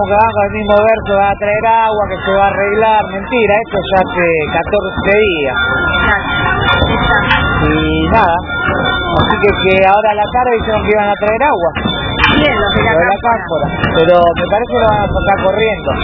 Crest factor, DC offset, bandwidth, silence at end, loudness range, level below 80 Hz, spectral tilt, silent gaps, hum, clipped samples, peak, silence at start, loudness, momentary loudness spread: 12 dB; under 0.1%; 5.4 kHz; 0 s; 1 LU; -26 dBFS; -8 dB/octave; none; none; 0.2%; 0 dBFS; 0 s; -11 LUFS; 5 LU